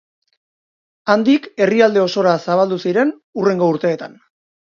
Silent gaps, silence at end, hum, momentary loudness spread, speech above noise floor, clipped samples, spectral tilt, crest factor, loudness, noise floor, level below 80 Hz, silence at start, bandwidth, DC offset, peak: 3.24-3.33 s; 0.7 s; none; 7 LU; over 75 dB; under 0.1%; -6.5 dB/octave; 18 dB; -16 LUFS; under -90 dBFS; -68 dBFS; 1.05 s; 7.4 kHz; under 0.1%; 0 dBFS